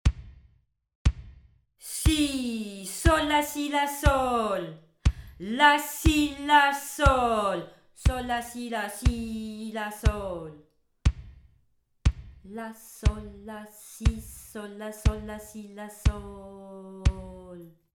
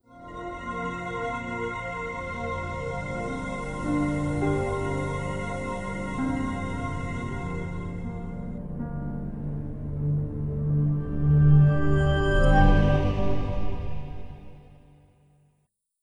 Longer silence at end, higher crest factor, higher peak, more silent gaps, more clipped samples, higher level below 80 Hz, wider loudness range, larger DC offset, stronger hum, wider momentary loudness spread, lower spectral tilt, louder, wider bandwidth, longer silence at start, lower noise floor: first, 0.25 s vs 0 s; about the same, 22 dB vs 20 dB; about the same, -6 dBFS vs -6 dBFS; first, 0.95-1.05 s vs none; neither; about the same, -32 dBFS vs -32 dBFS; about the same, 9 LU vs 10 LU; neither; neither; first, 21 LU vs 15 LU; second, -5 dB/octave vs -8 dB/octave; about the same, -27 LUFS vs -27 LUFS; first, 19.5 kHz vs 10 kHz; about the same, 0.05 s vs 0 s; second, -67 dBFS vs -73 dBFS